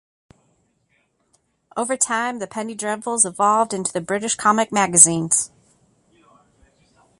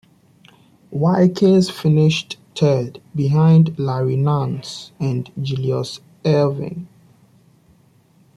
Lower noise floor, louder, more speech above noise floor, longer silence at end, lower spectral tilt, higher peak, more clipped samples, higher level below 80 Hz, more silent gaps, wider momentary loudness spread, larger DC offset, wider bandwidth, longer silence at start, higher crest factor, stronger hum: first, -66 dBFS vs -54 dBFS; about the same, -18 LUFS vs -18 LUFS; first, 47 dB vs 37 dB; first, 1.75 s vs 1.5 s; second, -2.5 dB/octave vs -7.5 dB/octave; first, 0 dBFS vs -4 dBFS; neither; second, -64 dBFS vs -56 dBFS; neither; about the same, 16 LU vs 15 LU; neither; first, 16 kHz vs 11 kHz; first, 1.75 s vs 0.9 s; first, 22 dB vs 14 dB; neither